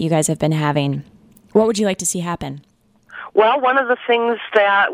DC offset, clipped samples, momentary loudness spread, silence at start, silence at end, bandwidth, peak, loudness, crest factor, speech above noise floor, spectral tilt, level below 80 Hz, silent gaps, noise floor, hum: under 0.1%; under 0.1%; 13 LU; 0 s; 0 s; 16 kHz; 0 dBFS; -17 LUFS; 18 dB; 25 dB; -4.5 dB/octave; -52 dBFS; none; -42 dBFS; none